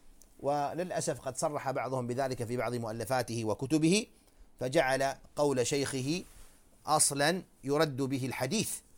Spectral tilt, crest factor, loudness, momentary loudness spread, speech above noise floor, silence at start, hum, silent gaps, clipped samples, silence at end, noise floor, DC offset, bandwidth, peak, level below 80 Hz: -4 dB/octave; 20 dB; -32 LUFS; 8 LU; 24 dB; 0.05 s; none; none; under 0.1%; 0.15 s; -55 dBFS; under 0.1%; 18 kHz; -12 dBFS; -60 dBFS